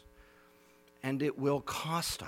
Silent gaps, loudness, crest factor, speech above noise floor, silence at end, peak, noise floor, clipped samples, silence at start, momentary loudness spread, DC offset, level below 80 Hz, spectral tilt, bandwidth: none; -34 LUFS; 18 dB; 29 dB; 0 s; -18 dBFS; -63 dBFS; under 0.1%; 0.05 s; 5 LU; under 0.1%; -62 dBFS; -4.5 dB/octave; 17 kHz